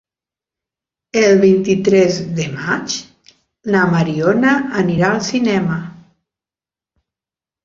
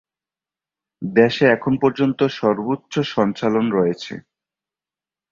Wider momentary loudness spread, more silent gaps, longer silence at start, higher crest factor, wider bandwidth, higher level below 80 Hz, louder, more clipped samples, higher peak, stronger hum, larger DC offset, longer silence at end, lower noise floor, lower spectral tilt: about the same, 11 LU vs 11 LU; neither; first, 1.15 s vs 1 s; about the same, 16 dB vs 18 dB; about the same, 7.6 kHz vs 7.4 kHz; about the same, -54 dBFS vs -58 dBFS; first, -15 LUFS vs -19 LUFS; neither; about the same, -2 dBFS vs -2 dBFS; neither; neither; first, 1.7 s vs 1.1 s; about the same, under -90 dBFS vs under -90 dBFS; second, -5.5 dB/octave vs -7 dB/octave